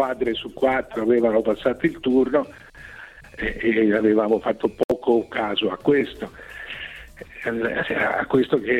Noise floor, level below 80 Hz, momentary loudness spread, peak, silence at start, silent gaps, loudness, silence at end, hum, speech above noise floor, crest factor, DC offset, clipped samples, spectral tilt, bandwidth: -42 dBFS; -48 dBFS; 18 LU; -6 dBFS; 0 s; 4.84-4.89 s; -22 LUFS; 0 s; none; 21 dB; 16 dB; under 0.1%; under 0.1%; -6.5 dB/octave; 13 kHz